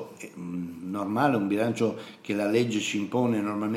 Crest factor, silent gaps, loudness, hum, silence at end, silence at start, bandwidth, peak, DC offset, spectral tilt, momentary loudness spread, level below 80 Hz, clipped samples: 18 dB; none; -27 LUFS; none; 0 s; 0 s; 15.5 kHz; -10 dBFS; under 0.1%; -5.5 dB/octave; 11 LU; -74 dBFS; under 0.1%